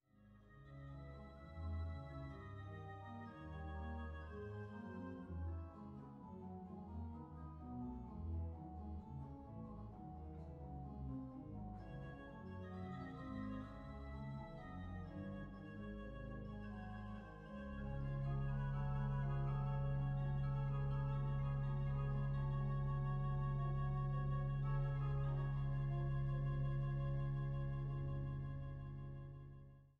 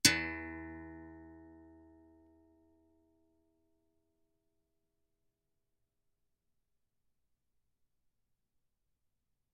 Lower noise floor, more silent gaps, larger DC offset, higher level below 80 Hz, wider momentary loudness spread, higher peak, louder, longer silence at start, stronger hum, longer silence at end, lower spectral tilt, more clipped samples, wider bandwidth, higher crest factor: second, -66 dBFS vs -83 dBFS; neither; neither; first, -52 dBFS vs -70 dBFS; second, 12 LU vs 24 LU; second, -32 dBFS vs -6 dBFS; second, -46 LUFS vs -36 LUFS; first, 0.2 s vs 0.05 s; neither; second, 0.1 s vs 7.85 s; first, -10 dB/octave vs -1 dB/octave; neither; second, 4.2 kHz vs 7.2 kHz; second, 12 dB vs 38 dB